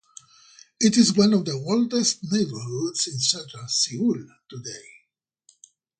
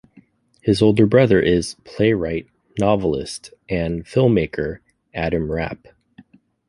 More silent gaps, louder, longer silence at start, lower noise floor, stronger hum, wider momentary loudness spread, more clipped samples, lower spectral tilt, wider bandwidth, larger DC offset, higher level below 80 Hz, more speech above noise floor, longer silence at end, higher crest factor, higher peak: neither; second, -22 LUFS vs -19 LUFS; first, 0.8 s vs 0.65 s; first, -71 dBFS vs -53 dBFS; neither; about the same, 19 LU vs 17 LU; neither; second, -4 dB/octave vs -6.5 dB/octave; second, 9.6 kHz vs 11.5 kHz; neither; second, -66 dBFS vs -42 dBFS; first, 48 dB vs 35 dB; first, 1.2 s vs 0.95 s; about the same, 20 dB vs 18 dB; about the same, -4 dBFS vs -2 dBFS